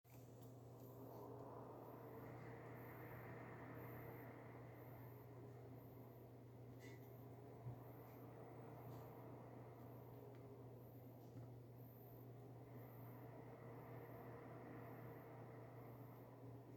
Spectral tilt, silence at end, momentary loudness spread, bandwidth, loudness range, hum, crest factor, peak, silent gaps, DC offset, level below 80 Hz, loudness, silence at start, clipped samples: -8 dB/octave; 0 s; 4 LU; 19 kHz; 3 LU; none; 14 dB; -44 dBFS; none; under 0.1%; -80 dBFS; -59 LUFS; 0.05 s; under 0.1%